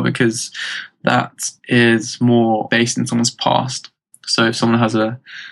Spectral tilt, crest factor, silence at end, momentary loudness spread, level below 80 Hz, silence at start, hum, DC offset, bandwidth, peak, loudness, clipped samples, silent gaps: -4.5 dB/octave; 16 dB; 0 s; 11 LU; -64 dBFS; 0 s; none; under 0.1%; 12 kHz; -2 dBFS; -17 LUFS; under 0.1%; none